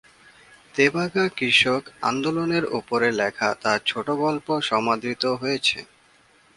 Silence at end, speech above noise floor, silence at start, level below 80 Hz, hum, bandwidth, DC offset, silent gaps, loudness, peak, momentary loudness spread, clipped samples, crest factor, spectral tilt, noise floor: 0.75 s; 34 dB; 0.75 s; -62 dBFS; none; 11.5 kHz; under 0.1%; none; -22 LUFS; -4 dBFS; 7 LU; under 0.1%; 20 dB; -4 dB/octave; -57 dBFS